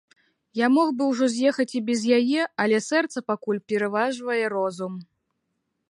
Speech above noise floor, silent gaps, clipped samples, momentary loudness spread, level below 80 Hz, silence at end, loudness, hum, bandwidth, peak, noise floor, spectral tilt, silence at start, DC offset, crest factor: 54 dB; none; under 0.1%; 8 LU; -76 dBFS; 0.85 s; -23 LUFS; none; 11.5 kHz; -8 dBFS; -77 dBFS; -4.5 dB/octave; 0.55 s; under 0.1%; 16 dB